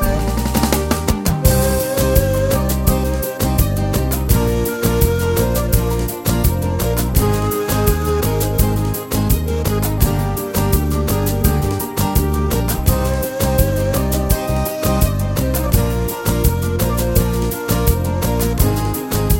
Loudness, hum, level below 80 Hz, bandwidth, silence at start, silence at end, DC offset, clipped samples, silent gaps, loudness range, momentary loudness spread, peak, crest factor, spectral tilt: -17 LUFS; none; -22 dBFS; 17 kHz; 0 s; 0 s; 0.1%; under 0.1%; none; 1 LU; 3 LU; 0 dBFS; 16 dB; -5.5 dB/octave